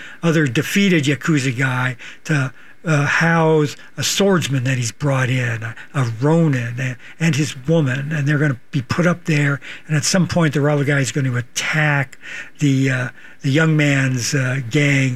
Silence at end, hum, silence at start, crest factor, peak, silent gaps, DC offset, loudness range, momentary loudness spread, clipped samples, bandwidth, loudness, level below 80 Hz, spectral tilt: 0 s; none; 0 s; 14 dB; -2 dBFS; none; 1%; 2 LU; 9 LU; under 0.1%; 14.5 kHz; -18 LUFS; -54 dBFS; -5.5 dB/octave